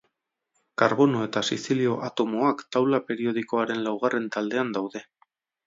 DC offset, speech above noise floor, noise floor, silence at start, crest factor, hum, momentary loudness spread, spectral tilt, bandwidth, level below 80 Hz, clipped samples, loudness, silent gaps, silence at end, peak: under 0.1%; 53 dB; -78 dBFS; 0.8 s; 22 dB; none; 6 LU; -5.5 dB/octave; 7.8 kHz; -72 dBFS; under 0.1%; -25 LUFS; none; 0.65 s; -4 dBFS